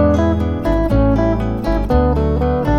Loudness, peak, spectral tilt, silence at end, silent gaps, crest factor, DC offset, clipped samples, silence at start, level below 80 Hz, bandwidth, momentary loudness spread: -16 LUFS; -2 dBFS; -9 dB/octave; 0 s; none; 12 dB; under 0.1%; under 0.1%; 0 s; -20 dBFS; 7 kHz; 4 LU